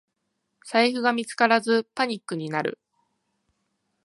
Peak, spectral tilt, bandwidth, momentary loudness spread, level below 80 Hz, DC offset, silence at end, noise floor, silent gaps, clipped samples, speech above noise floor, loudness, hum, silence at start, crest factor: -4 dBFS; -4 dB/octave; 11.5 kHz; 8 LU; -80 dBFS; under 0.1%; 1.35 s; -78 dBFS; none; under 0.1%; 54 dB; -24 LUFS; none; 0.65 s; 22 dB